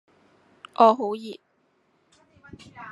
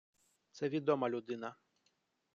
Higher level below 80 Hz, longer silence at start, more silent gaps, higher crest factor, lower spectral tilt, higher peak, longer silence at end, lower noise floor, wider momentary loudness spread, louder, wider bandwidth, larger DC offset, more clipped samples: first, -72 dBFS vs -84 dBFS; first, 0.8 s vs 0.55 s; neither; about the same, 24 dB vs 22 dB; about the same, -6 dB/octave vs -7 dB/octave; first, -4 dBFS vs -18 dBFS; second, 0 s vs 0.8 s; second, -68 dBFS vs -80 dBFS; first, 26 LU vs 10 LU; first, -21 LUFS vs -37 LUFS; first, 11 kHz vs 8.2 kHz; neither; neither